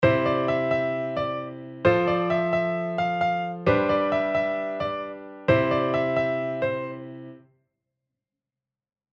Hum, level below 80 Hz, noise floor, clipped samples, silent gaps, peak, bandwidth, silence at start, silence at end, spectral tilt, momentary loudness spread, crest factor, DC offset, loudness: none; -54 dBFS; -90 dBFS; under 0.1%; none; -6 dBFS; 7 kHz; 0 s; 1.75 s; -8 dB/octave; 12 LU; 20 dB; under 0.1%; -25 LUFS